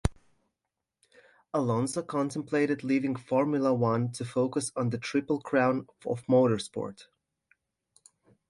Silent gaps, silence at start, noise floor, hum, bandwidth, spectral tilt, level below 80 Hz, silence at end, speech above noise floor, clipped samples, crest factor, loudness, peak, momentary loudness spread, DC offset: none; 0.05 s; -87 dBFS; none; 11.5 kHz; -6 dB/octave; -50 dBFS; 1.45 s; 58 dB; under 0.1%; 20 dB; -29 LUFS; -10 dBFS; 9 LU; under 0.1%